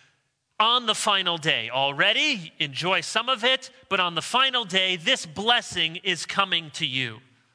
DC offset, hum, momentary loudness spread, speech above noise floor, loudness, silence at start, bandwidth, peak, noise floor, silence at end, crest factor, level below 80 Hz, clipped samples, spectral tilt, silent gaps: under 0.1%; none; 6 LU; 46 dB; -23 LUFS; 0.6 s; 11 kHz; -4 dBFS; -71 dBFS; 0.35 s; 20 dB; -68 dBFS; under 0.1%; -2 dB/octave; none